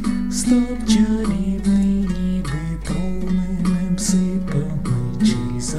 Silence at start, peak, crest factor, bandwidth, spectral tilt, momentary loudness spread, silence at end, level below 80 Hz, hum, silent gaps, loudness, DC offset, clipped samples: 0 s; -4 dBFS; 14 dB; 13.5 kHz; -6 dB/octave; 6 LU; 0 s; -32 dBFS; none; none; -20 LUFS; 3%; under 0.1%